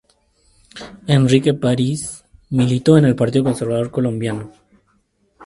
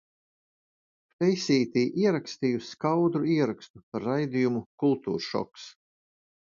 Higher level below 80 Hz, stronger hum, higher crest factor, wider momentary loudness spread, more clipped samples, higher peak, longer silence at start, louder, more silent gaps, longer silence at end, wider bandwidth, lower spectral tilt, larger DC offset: first, -50 dBFS vs -70 dBFS; neither; about the same, 18 dB vs 18 dB; first, 19 LU vs 11 LU; neither; first, 0 dBFS vs -12 dBFS; second, 0.75 s vs 1.2 s; first, -17 LUFS vs -27 LUFS; second, none vs 3.70-3.74 s, 3.83-3.92 s, 4.66-4.78 s; second, 0 s vs 0.75 s; first, 11.5 kHz vs 7.6 kHz; about the same, -6.5 dB/octave vs -6.5 dB/octave; neither